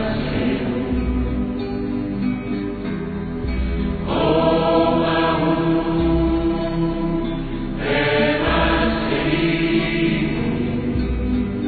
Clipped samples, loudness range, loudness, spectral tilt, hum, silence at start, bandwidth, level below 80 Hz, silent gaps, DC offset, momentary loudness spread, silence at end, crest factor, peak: under 0.1%; 5 LU; -20 LUFS; -10 dB/octave; none; 0 s; 4.8 kHz; -30 dBFS; none; under 0.1%; 8 LU; 0 s; 14 dB; -4 dBFS